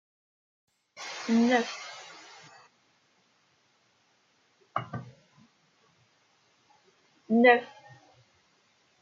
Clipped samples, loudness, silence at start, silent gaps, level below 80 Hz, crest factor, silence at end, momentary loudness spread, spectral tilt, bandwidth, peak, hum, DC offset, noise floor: under 0.1%; -26 LUFS; 1 s; none; -84 dBFS; 24 dB; 1.35 s; 27 LU; -5 dB/octave; 7.6 kHz; -8 dBFS; none; under 0.1%; -69 dBFS